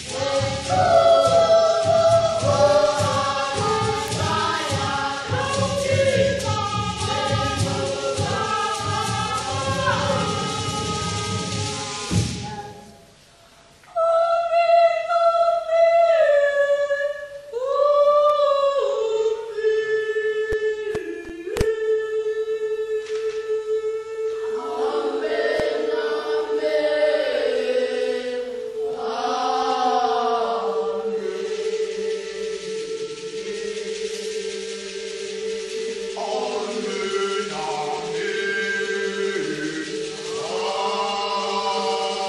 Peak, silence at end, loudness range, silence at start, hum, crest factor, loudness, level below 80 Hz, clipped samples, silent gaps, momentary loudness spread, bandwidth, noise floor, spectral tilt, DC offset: -4 dBFS; 0 s; 9 LU; 0 s; none; 18 dB; -22 LUFS; -48 dBFS; under 0.1%; none; 11 LU; 12.5 kHz; -51 dBFS; -4 dB/octave; under 0.1%